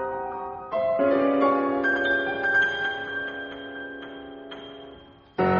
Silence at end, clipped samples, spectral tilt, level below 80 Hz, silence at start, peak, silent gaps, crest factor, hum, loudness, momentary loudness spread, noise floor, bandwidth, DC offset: 0 s; under 0.1%; -3 dB/octave; -60 dBFS; 0 s; -10 dBFS; none; 16 dB; none; -24 LUFS; 18 LU; -48 dBFS; 7 kHz; under 0.1%